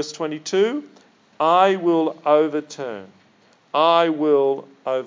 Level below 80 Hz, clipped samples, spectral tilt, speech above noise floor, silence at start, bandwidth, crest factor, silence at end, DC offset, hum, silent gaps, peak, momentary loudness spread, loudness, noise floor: -84 dBFS; under 0.1%; -5 dB/octave; 37 dB; 0 s; 7.6 kHz; 18 dB; 0 s; under 0.1%; none; none; -2 dBFS; 15 LU; -19 LUFS; -56 dBFS